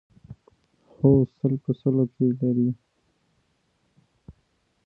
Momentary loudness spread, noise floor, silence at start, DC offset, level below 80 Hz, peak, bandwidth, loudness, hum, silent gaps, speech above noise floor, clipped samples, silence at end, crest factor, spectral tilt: 7 LU; -70 dBFS; 0.3 s; under 0.1%; -54 dBFS; -6 dBFS; 4 kHz; -23 LUFS; none; none; 48 dB; under 0.1%; 0.55 s; 20 dB; -13.5 dB/octave